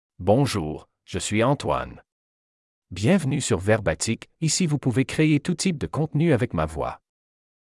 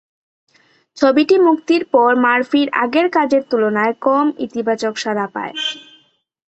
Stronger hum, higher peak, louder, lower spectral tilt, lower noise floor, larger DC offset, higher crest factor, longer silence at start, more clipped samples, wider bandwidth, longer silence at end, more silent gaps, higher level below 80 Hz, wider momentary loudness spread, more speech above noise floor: neither; second, -6 dBFS vs -2 dBFS; second, -23 LUFS vs -16 LUFS; about the same, -5.5 dB/octave vs -4.5 dB/octave; first, under -90 dBFS vs -54 dBFS; neither; about the same, 18 dB vs 14 dB; second, 0.2 s vs 0.95 s; neither; first, 12 kHz vs 8.2 kHz; first, 0.85 s vs 0.7 s; first, 2.12-2.82 s vs none; first, -48 dBFS vs -64 dBFS; about the same, 11 LU vs 9 LU; first, over 67 dB vs 38 dB